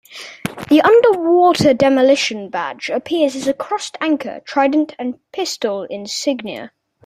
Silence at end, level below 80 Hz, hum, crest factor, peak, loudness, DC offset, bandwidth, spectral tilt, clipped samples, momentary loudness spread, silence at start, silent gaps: 0.4 s; -58 dBFS; none; 16 dB; 0 dBFS; -16 LUFS; under 0.1%; 15 kHz; -4.5 dB/octave; under 0.1%; 14 LU; 0.1 s; none